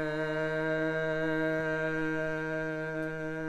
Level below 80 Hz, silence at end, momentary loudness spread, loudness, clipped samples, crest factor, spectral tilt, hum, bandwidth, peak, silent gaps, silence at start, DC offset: -58 dBFS; 0 s; 4 LU; -32 LUFS; under 0.1%; 12 dB; -7 dB/octave; none; 11.5 kHz; -20 dBFS; none; 0 s; under 0.1%